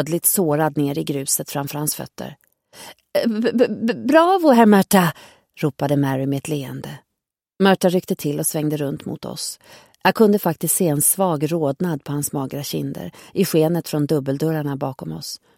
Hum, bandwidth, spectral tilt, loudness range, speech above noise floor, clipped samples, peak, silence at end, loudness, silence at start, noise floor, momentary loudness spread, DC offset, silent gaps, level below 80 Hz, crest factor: none; 17 kHz; -5 dB/octave; 5 LU; 62 dB; under 0.1%; 0 dBFS; 0.2 s; -19 LUFS; 0 s; -82 dBFS; 15 LU; under 0.1%; none; -60 dBFS; 20 dB